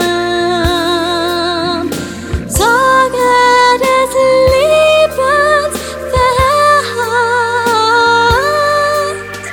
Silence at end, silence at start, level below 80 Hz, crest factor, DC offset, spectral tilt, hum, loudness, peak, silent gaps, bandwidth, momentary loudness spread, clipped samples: 0 s; 0 s; -30 dBFS; 12 dB; under 0.1%; -3.5 dB/octave; none; -11 LUFS; 0 dBFS; none; 19 kHz; 8 LU; under 0.1%